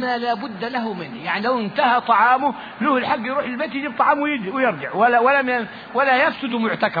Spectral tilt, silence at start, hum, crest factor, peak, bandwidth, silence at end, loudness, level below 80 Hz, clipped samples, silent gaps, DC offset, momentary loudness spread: -7 dB/octave; 0 s; none; 16 dB; -4 dBFS; 5 kHz; 0 s; -20 LUFS; -62 dBFS; under 0.1%; none; under 0.1%; 9 LU